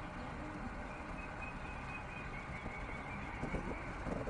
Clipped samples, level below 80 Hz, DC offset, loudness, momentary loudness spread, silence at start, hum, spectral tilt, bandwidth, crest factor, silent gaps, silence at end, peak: under 0.1%; -50 dBFS; under 0.1%; -45 LUFS; 4 LU; 0 s; none; -6.5 dB/octave; 10 kHz; 16 dB; none; 0 s; -28 dBFS